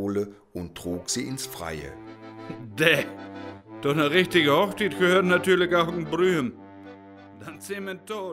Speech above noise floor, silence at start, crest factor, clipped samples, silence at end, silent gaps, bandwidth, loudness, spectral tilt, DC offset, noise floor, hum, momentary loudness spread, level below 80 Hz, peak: 21 dB; 0 s; 22 dB; under 0.1%; 0 s; none; 16 kHz; -24 LUFS; -4.5 dB/octave; under 0.1%; -46 dBFS; none; 22 LU; -58 dBFS; -4 dBFS